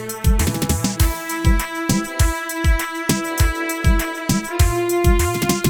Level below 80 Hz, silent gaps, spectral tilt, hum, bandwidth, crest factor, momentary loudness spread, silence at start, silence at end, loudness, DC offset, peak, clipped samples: -22 dBFS; none; -4.5 dB/octave; none; over 20 kHz; 16 dB; 3 LU; 0 s; 0 s; -19 LUFS; under 0.1%; -2 dBFS; under 0.1%